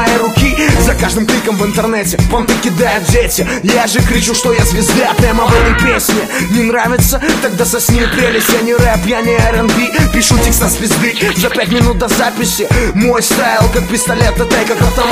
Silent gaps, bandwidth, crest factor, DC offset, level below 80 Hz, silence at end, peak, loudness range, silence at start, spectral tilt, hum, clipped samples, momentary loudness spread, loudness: none; 16 kHz; 10 dB; under 0.1%; -20 dBFS; 0 s; 0 dBFS; 1 LU; 0 s; -4 dB/octave; none; under 0.1%; 3 LU; -11 LUFS